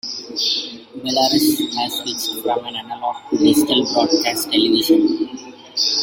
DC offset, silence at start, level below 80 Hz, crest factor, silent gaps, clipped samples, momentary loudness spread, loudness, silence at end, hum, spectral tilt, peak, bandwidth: under 0.1%; 0.05 s; -60 dBFS; 16 dB; none; under 0.1%; 11 LU; -18 LUFS; 0 s; none; -3 dB/octave; -2 dBFS; 17 kHz